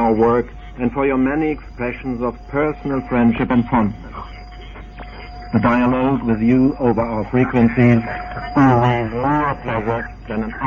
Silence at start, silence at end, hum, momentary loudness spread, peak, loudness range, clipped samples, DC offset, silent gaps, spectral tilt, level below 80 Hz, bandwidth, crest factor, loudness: 0 s; 0 s; none; 19 LU; -2 dBFS; 4 LU; under 0.1%; under 0.1%; none; -9.5 dB/octave; -36 dBFS; 6.6 kHz; 14 dB; -18 LUFS